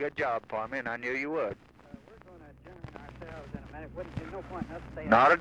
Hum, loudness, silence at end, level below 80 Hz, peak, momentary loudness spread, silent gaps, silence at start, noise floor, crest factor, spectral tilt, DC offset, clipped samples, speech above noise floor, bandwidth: none; -31 LUFS; 0 s; -54 dBFS; -8 dBFS; 24 LU; none; 0 s; -52 dBFS; 22 dB; -6.5 dB/octave; under 0.1%; under 0.1%; 23 dB; 10.5 kHz